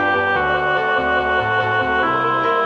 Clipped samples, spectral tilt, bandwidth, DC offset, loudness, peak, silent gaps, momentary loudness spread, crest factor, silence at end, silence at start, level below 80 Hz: under 0.1%; -6 dB/octave; 8.8 kHz; under 0.1%; -17 LUFS; -6 dBFS; none; 1 LU; 12 dB; 0 s; 0 s; -44 dBFS